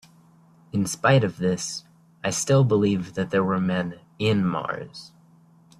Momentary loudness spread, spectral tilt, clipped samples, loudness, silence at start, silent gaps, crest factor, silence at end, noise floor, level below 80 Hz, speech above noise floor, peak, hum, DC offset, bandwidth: 13 LU; -5.5 dB/octave; under 0.1%; -24 LUFS; 0.75 s; none; 18 dB; 0.7 s; -55 dBFS; -60 dBFS; 32 dB; -6 dBFS; none; under 0.1%; 14 kHz